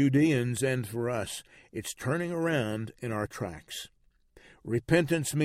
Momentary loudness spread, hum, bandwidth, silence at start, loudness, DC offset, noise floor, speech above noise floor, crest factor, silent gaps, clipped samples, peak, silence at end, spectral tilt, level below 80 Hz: 15 LU; none; 16 kHz; 0 s; -30 LUFS; under 0.1%; -61 dBFS; 31 dB; 18 dB; none; under 0.1%; -12 dBFS; 0 s; -5.5 dB/octave; -58 dBFS